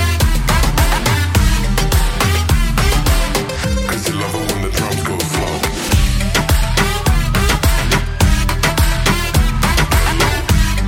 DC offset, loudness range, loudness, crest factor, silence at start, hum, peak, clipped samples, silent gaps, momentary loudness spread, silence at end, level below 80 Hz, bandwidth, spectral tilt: under 0.1%; 3 LU; -15 LUFS; 14 dB; 0 s; none; 0 dBFS; under 0.1%; none; 4 LU; 0 s; -18 dBFS; 17 kHz; -4 dB/octave